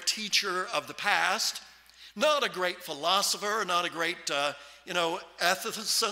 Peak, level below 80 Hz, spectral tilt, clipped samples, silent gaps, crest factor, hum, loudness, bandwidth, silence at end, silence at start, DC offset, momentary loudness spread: -8 dBFS; -74 dBFS; -1 dB/octave; under 0.1%; none; 22 dB; none; -28 LUFS; 16 kHz; 0 s; 0 s; under 0.1%; 7 LU